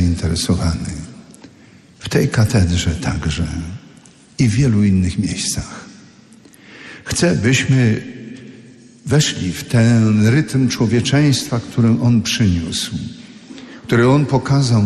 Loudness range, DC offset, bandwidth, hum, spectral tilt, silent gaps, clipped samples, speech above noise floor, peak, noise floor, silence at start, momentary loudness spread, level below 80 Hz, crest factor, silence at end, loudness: 5 LU; under 0.1%; 13 kHz; none; -5.5 dB/octave; none; under 0.1%; 30 dB; -4 dBFS; -45 dBFS; 0 s; 20 LU; -36 dBFS; 14 dB; 0 s; -16 LUFS